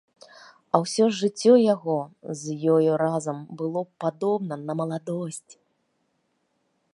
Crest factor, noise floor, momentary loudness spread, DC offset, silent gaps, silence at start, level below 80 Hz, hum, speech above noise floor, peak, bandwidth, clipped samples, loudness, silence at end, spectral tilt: 24 dB; -72 dBFS; 14 LU; under 0.1%; none; 0.75 s; -78 dBFS; none; 49 dB; -2 dBFS; 11.5 kHz; under 0.1%; -24 LUFS; 1.55 s; -6 dB/octave